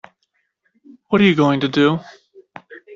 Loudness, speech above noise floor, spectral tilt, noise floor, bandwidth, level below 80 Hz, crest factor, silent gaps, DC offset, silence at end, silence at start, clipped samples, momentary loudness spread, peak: -16 LUFS; 54 dB; -7 dB/octave; -70 dBFS; 7.4 kHz; -58 dBFS; 16 dB; none; under 0.1%; 0 s; 1.1 s; under 0.1%; 22 LU; -4 dBFS